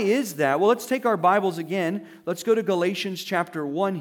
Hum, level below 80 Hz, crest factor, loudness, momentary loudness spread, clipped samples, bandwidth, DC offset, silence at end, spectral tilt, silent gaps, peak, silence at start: none; -82 dBFS; 16 dB; -24 LUFS; 8 LU; under 0.1%; 20 kHz; under 0.1%; 0 s; -5 dB/octave; none; -6 dBFS; 0 s